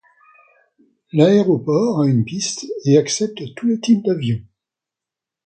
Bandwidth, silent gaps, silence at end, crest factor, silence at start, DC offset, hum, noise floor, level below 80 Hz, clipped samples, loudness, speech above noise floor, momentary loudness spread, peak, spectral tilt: 9 kHz; none; 1.05 s; 18 dB; 1.15 s; under 0.1%; none; -87 dBFS; -58 dBFS; under 0.1%; -18 LUFS; 70 dB; 10 LU; 0 dBFS; -6 dB/octave